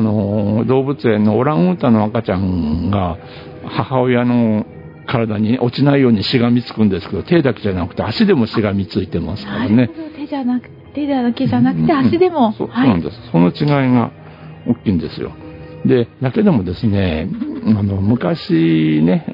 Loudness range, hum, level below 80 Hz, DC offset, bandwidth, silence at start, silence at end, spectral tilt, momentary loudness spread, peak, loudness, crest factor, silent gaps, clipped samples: 3 LU; none; -46 dBFS; under 0.1%; 5.4 kHz; 0 s; 0 s; -10 dB/octave; 10 LU; 0 dBFS; -16 LUFS; 16 dB; none; under 0.1%